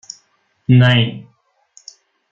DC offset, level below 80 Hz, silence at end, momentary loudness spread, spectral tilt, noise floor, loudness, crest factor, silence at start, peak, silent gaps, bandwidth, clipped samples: under 0.1%; -54 dBFS; 1.1 s; 25 LU; -6.5 dB/octave; -61 dBFS; -13 LUFS; 16 dB; 0.7 s; -2 dBFS; none; 7.4 kHz; under 0.1%